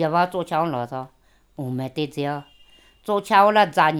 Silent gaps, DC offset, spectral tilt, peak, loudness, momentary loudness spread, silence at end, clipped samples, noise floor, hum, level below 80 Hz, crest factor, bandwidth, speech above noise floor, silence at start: none; under 0.1%; -6 dB/octave; -2 dBFS; -21 LUFS; 18 LU; 0 s; under 0.1%; -53 dBFS; none; -62 dBFS; 20 dB; 17 kHz; 32 dB; 0 s